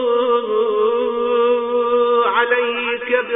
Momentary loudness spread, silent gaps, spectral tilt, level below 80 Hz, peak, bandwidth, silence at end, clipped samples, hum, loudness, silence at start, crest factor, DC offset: 4 LU; none; -6.5 dB/octave; -58 dBFS; -2 dBFS; 3.8 kHz; 0 s; under 0.1%; none; -17 LUFS; 0 s; 16 dB; under 0.1%